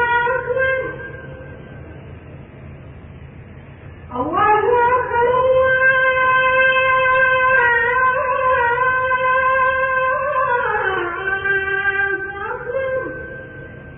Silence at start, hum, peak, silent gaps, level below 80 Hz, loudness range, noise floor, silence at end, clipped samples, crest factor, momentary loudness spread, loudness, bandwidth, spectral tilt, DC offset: 0 s; none; -4 dBFS; none; -44 dBFS; 12 LU; -38 dBFS; 0 s; under 0.1%; 14 dB; 21 LU; -16 LUFS; 3.8 kHz; -9.5 dB/octave; under 0.1%